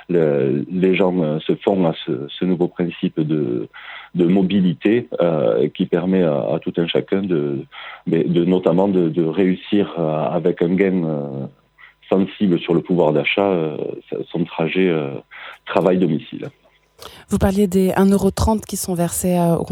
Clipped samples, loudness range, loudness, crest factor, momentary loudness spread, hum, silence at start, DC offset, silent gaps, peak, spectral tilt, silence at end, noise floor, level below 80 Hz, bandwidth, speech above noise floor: under 0.1%; 2 LU; -19 LUFS; 18 dB; 11 LU; none; 0.1 s; under 0.1%; none; 0 dBFS; -6.5 dB/octave; 0 s; -48 dBFS; -42 dBFS; 17 kHz; 30 dB